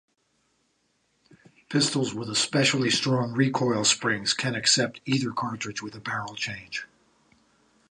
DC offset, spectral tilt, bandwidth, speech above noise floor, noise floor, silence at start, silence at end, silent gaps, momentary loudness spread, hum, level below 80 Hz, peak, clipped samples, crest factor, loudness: under 0.1%; -3 dB/octave; 11 kHz; 45 dB; -71 dBFS; 1.7 s; 1.05 s; none; 11 LU; none; -66 dBFS; -8 dBFS; under 0.1%; 20 dB; -25 LUFS